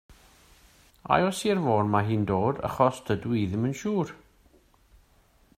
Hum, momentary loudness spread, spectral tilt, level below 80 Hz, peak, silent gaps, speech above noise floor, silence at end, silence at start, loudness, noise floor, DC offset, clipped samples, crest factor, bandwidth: none; 6 LU; -6.5 dB/octave; -56 dBFS; -6 dBFS; none; 36 dB; 1.45 s; 0.1 s; -26 LUFS; -62 dBFS; under 0.1%; under 0.1%; 22 dB; 15.5 kHz